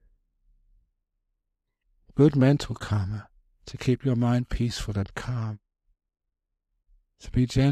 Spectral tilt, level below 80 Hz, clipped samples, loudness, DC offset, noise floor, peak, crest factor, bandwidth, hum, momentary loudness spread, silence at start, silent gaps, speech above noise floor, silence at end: -7.5 dB/octave; -44 dBFS; under 0.1%; -26 LUFS; under 0.1%; -83 dBFS; -6 dBFS; 20 dB; 12 kHz; none; 13 LU; 2.15 s; none; 59 dB; 0 s